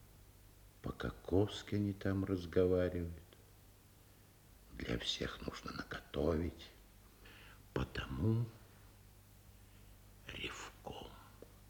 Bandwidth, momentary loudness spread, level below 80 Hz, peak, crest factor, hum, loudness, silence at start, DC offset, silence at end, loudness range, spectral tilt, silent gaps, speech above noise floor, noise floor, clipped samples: over 20 kHz; 25 LU; -58 dBFS; -20 dBFS; 22 dB; none; -40 LUFS; 0 s; under 0.1%; 0 s; 6 LU; -6 dB/octave; none; 25 dB; -63 dBFS; under 0.1%